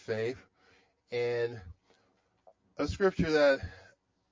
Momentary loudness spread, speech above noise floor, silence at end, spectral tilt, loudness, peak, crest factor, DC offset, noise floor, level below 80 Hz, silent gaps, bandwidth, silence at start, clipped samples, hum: 21 LU; 42 dB; 0.5 s; -6 dB/octave; -31 LUFS; -14 dBFS; 18 dB; under 0.1%; -72 dBFS; -52 dBFS; none; 7.6 kHz; 0.1 s; under 0.1%; none